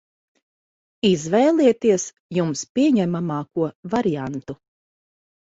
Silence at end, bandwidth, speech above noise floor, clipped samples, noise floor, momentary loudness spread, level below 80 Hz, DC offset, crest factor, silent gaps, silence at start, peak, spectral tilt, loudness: 0.9 s; 8 kHz; over 70 dB; under 0.1%; under -90 dBFS; 11 LU; -60 dBFS; under 0.1%; 18 dB; 2.20-2.29 s, 2.69-2.75 s, 3.75-3.83 s; 1.05 s; -4 dBFS; -5.5 dB/octave; -21 LUFS